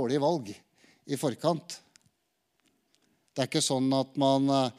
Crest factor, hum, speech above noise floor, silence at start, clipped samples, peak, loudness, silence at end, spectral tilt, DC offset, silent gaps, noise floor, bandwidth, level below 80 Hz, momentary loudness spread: 18 dB; none; 50 dB; 0 s; under 0.1%; -12 dBFS; -28 LUFS; 0.05 s; -5 dB/octave; under 0.1%; none; -77 dBFS; 15 kHz; -80 dBFS; 18 LU